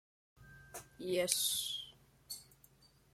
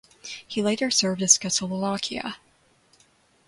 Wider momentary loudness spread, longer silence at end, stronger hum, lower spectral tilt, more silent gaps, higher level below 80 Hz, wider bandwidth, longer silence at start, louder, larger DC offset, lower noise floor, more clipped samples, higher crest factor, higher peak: about the same, 20 LU vs 19 LU; second, 0.7 s vs 1.1 s; neither; about the same, -1.5 dB/octave vs -2.5 dB/octave; neither; second, -72 dBFS vs -64 dBFS; first, 16.5 kHz vs 11.5 kHz; first, 0.4 s vs 0.25 s; second, -37 LUFS vs -23 LUFS; neither; first, -67 dBFS vs -62 dBFS; neither; about the same, 30 dB vs 26 dB; second, -12 dBFS vs -2 dBFS